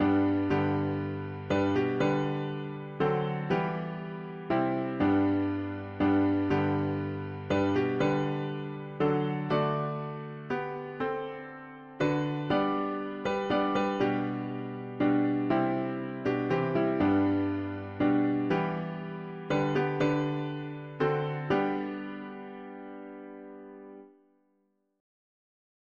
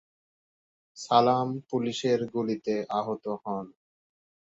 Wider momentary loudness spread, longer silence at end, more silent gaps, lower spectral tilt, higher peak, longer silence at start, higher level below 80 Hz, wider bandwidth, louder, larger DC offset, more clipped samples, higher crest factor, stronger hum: about the same, 13 LU vs 13 LU; first, 1.9 s vs 0.9 s; neither; first, -8 dB/octave vs -5.5 dB/octave; second, -14 dBFS vs -6 dBFS; second, 0 s vs 0.95 s; first, -60 dBFS vs -72 dBFS; second, 7 kHz vs 8 kHz; about the same, -30 LUFS vs -28 LUFS; neither; neither; second, 16 dB vs 24 dB; neither